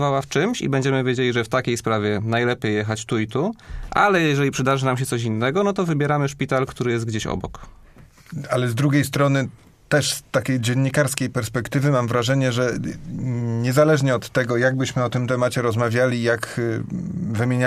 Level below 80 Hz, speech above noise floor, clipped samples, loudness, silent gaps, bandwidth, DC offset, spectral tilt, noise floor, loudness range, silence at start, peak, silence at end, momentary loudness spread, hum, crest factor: -46 dBFS; 26 dB; under 0.1%; -21 LUFS; none; 15.5 kHz; under 0.1%; -5.5 dB/octave; -47 dBFS; 3 LU; 0 s; -2 dBFS; 0 s; 7 LU; none; 20 dB